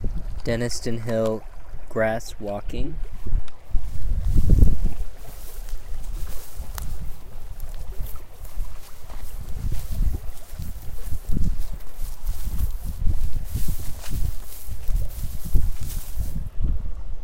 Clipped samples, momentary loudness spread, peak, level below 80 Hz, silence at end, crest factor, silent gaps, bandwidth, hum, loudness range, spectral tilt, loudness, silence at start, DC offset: under 0.1%; 15 LU; -2 dBFS; -26 dBFS; 0 s; 18 dB; none; 16.5 kHz; none; 11 LU; -6 dB/octave; -30 LUFS; 0 s; under 0.1%